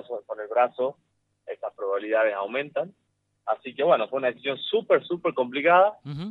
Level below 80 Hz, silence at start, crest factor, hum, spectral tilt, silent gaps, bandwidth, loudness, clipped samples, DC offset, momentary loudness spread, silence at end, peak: -74 dBFS; 0.1 s; 20 dB; none; -7.5 dB/octave; none; 4.7 kHz; -25 LUFS; under 0.1%; under 0.1%; 15 LU; 0 s; -6 dBFS